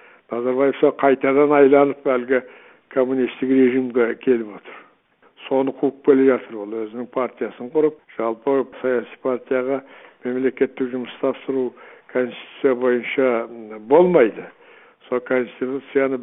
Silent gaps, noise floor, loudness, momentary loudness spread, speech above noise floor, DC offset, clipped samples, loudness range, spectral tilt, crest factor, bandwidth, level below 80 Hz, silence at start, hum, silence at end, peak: none; -57 dBFS; -20 LUFS; 12 LU; 38 dB; under 0.1%; under 0.1%; 6 LU; -11 dB/octave; 20 dB; 3.9 kHz; -70 dBFS; 0.3 s; none; 0 s; 0 dBFS